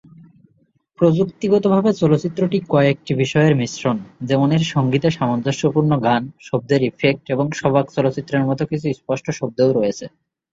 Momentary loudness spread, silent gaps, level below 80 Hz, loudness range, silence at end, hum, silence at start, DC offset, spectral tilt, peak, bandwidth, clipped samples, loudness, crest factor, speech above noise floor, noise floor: 7 LU; none; -56 dBFS; 3 LU; 0.45 s; none; 1 s; under 0.1%; -7 dB/octave; -2 dBFS; 7.8 kHz; under 0.1%; -18 LUFS; 16 dB; 44 dB; -61 dBFS